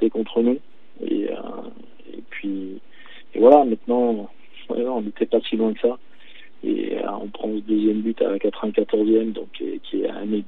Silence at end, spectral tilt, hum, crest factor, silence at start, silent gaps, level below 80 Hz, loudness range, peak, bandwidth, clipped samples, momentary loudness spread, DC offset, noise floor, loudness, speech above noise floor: 0.05 s; -9 dB/octave; none; 22 dB; 0 s; none; -72 dBFS; 5 LU; 0 dBFS; 4.1 kHz; under 0.1%; 17 LU; 2%; -49 dBFS; -22 LUFS; 28 dB